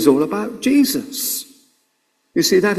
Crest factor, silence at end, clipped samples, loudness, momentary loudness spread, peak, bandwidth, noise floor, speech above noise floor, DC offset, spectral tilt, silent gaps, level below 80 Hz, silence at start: 18 dB; 0 s; under 0.1%; -18 LUFS; 10 LU; 0 dBFS; 16 kHz; -67 dBFS; 50 dB; under 0.1%; -3.5 dB/octave; none; -58 dBFS; 0 s